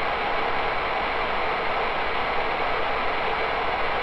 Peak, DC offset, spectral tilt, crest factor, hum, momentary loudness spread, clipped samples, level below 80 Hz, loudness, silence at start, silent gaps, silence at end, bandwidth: -14 dBFS; under 0.1%; -5 dB/octave; 10 dB; none; 0 LU; under 0.1%; -40 dBFS; -25 LUFS; 0 s; none; 0 s; 8.8 kHz